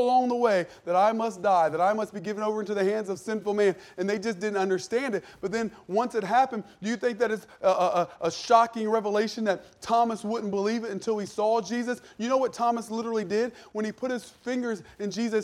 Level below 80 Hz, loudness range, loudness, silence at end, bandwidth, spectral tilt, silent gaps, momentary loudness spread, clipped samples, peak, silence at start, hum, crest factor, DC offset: -70 dBFS; 3 LU; -27 LUFS; 0 s; 14 kHz; -5 dB/octave; none; 9 LU; under 0.1%; -6 dBFS; 0 s; none; 20 dB; under 0.1%